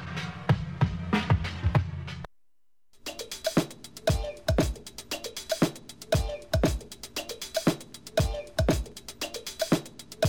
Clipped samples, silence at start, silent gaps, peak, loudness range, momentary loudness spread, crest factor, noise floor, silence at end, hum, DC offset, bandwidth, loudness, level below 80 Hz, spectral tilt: under 0.1%; 0 s; none; -10 dBFS; 2 LU; 11 LU; 18 dB; -79 dBFS; 0 s; none; 0.2%; 19.5 kHz; -30 LUFS; -38 dBFS; -5.5 dB/octave